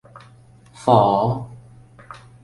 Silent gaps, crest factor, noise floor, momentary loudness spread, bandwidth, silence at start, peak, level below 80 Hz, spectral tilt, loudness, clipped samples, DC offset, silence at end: none; 20 dB; -48 dBFS; 26 LU; 11.5 kHz; 0.8 s; -2 dBFS; -54 dBFS; -8 dB/octave; -18 LUFS; under 0.1%; under 0.1%; 0.25 s